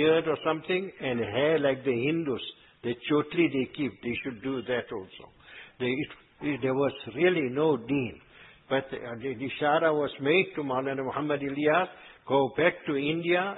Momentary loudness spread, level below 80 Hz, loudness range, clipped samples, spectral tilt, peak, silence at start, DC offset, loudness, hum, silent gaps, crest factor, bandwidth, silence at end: 11 LU; -64 dBFS; 4 LU; under 0.1%; -10 dB/octave; -8 dBFS; 0 s; under 0.1%; -28 LUFS; none; none; 20 dB; 4.1 kHz; 0 s